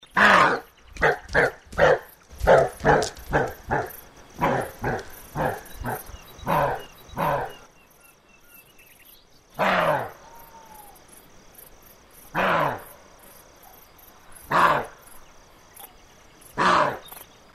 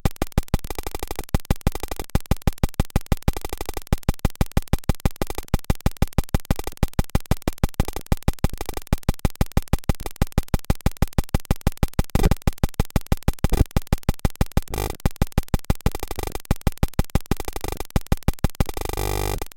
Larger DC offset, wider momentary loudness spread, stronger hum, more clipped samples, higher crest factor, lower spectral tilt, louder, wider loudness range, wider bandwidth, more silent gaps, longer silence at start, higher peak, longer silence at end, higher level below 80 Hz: neither; first, 19 LU vs 4 LU; neither; neither; about the same, 22 dB vs 20 dB; second, -4.5 dB/octave vs -6 dB/octave; first, -23 LUFS vs -26 LUFS; first, 8 LU vs 2 LU; second, 15 kHz vs 17 kHz; neither; about the same, 0.15 s vs 0.05 s; about the same, -4 dBFS vs -4 dBFS; first, 0.3 s vs 0.05 s; second, -44 dBFS vs -26 dBFS